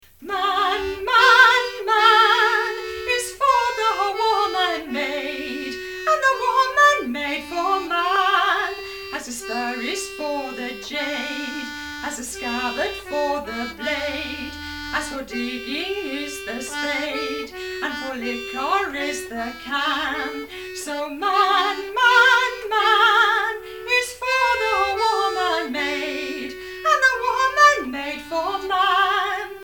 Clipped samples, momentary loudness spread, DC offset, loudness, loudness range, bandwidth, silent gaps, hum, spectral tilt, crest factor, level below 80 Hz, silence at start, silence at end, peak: under 0.1%; 14 LU; 0.2%; -20 LUFS; 9 LU; 18 kHz; none; none; -1.5 dB/octave; 20 dB; -52 dBFS; 0.2 s; 0 s; 0 dBFS